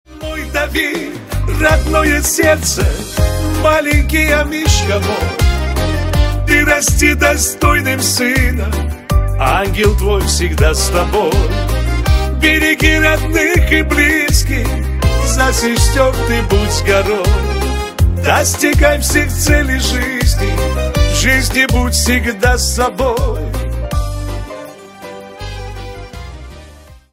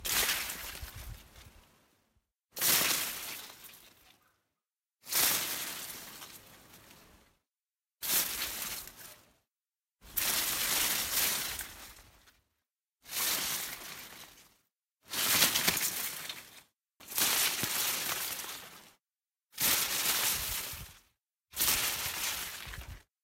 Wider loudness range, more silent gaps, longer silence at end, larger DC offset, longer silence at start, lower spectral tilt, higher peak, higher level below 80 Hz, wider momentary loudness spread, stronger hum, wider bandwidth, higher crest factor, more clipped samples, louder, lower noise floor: about the same, 4 LU vs 6 LU; neither; about the same, 0.2 s vs 0.25 s; neither; about the same, 0.1 s vs 0 s; first, -4 dB/octave vs 0 dB/octave; first, 0 dBFS vs -10 dBFS; first, -18 dBFS vs -58 dBFS; second, 11 LU vs 21 LU; neither; about the same, 16.5 kHz vs 16 kHz; second, 14 dB vs 26 dB; neither; first, -13 LUFS vs -30 LUFS; second, -38 dBFS vs under -90 dBFS